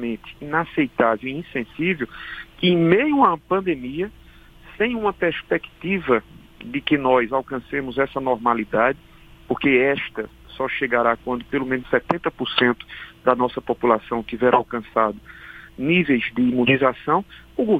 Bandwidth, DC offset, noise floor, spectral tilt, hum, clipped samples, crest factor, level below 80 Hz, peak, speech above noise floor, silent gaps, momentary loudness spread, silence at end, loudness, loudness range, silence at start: 5 kHz; under 0.1%; -46 dBFS; -7.5 dB/octave; none; under 0.1%; 22 dB; -50 dBFS; 0 dBFS; 25 dB; none; 12 LU; 0 s; -21 LUFS; 2 LU; 0 s